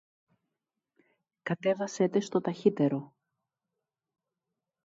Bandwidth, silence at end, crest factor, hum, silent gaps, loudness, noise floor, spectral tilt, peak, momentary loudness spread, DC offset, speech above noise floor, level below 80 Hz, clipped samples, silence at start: 7.8 kHz; 1.8 s; 22 dB; none; none; -30 LUFS; -88 dBFS; -6.5 dB/octave; -10 dBFS; 9 LU; under 0.1%; 59 dB; -80 dBFS; under 0.1%; 1.45 s